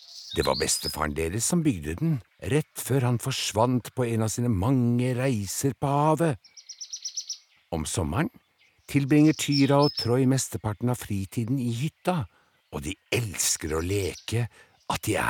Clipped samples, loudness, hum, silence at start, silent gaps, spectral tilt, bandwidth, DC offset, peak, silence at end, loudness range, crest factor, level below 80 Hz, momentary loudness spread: under 0.1%; -26 LUFS; none; 0.1 s; none; -5 dB/octave; 18.5 kHz; under 0.1%; -8 dBFS; 0 s; 5 LU; 18 dB; -48 dBFS; 12 LU